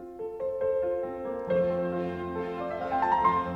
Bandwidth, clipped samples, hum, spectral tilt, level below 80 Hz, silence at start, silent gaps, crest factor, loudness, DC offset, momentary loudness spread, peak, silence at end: 6.2 kHz; under 0.1%; none; -8 dB/octave; -56 dBFS; 0 s; none; 16 dB; -29 LUFS; under 0.1%; 9 LU; -12 dBFS; 0 s